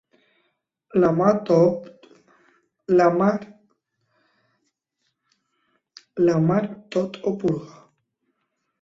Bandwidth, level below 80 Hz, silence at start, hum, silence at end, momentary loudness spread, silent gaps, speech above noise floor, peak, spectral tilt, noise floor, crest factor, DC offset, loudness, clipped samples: 7.6 kHz; -62 dBFS; 0.95 s; none; 1.15 s; 13 LU; none; 56 dB; -4 dBFS; -8.5 dB/octave; -76 dBFS; 20 dB; under 0.1%; -21 LUFS; under 0.1%